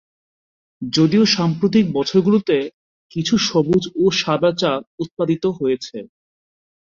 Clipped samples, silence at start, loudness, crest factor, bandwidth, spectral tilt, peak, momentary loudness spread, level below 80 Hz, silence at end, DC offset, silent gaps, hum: under 0.1%; 0.8 s; -18 LUFS; 16 dB; 7.6 kHz; -5.5 dB/octave; -4 dBFS; 13 LU; -54 dBFS; 0.8 s; under 0.1%; 2.74-3.10 s, 4.87-4.98 s, 5.11-5.17 s; none